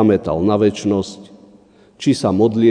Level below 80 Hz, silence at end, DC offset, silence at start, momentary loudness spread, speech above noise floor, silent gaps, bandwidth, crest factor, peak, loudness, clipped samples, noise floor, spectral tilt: -48 dBFS; 0 s; under 0.1%; 0 s; 8 LU; 33 dB; none; 10 kHz; 16 dB; 0 dBFS; -17 LUFS; under 0.1%; -48 dBFS; -7 dB/octave